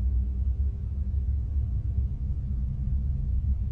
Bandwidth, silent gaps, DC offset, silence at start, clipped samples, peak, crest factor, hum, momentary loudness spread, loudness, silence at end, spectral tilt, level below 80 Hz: 1.3 kHz; none; under 0.1%; 0 s; under 0.1%; -16 dBFS; 10 dB; none; 2 LU; -30 LUFS; 0 s; -11.5 dB/octave; -28 dBFS